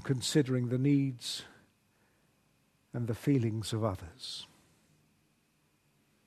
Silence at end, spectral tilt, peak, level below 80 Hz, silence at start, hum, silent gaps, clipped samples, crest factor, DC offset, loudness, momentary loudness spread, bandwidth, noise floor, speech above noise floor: 1.8 s; -6 dB/octave; -16 dBFS; -66 dBFS; 0 s; none; none; under 0.1%; 18 dB; under 0.1%; -32 LUFS; 13 LU; 13.5 kHz; -72 dBFS; 41 dB